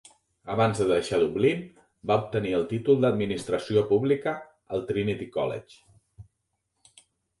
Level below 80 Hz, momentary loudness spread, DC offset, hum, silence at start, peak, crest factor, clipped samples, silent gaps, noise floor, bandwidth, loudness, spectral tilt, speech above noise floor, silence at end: -58 dBFS; 11 LU; under 0.1%; none; 0.45 s; -10 dBFS; 18 dB; under 0.1%; none; -78 dBFS; 11.5 kHz; -26 LUFS; -6.5 dB/octave; 53 dB; 1.2 s